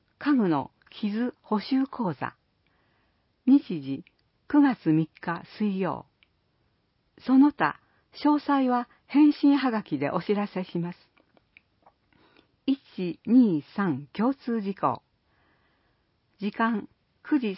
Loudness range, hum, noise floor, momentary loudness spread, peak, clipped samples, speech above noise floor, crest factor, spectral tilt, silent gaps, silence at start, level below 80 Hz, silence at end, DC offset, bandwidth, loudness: 7 LU; none; -71 dBFS; 13 LU; -8 dBFS; under 0.1%; 46 dB; 18 dB; -11 dB/octave; none; 0.2 s; -70 dBFS; 0 s; under 0.1%; 5.8 kHz; -26 LUFS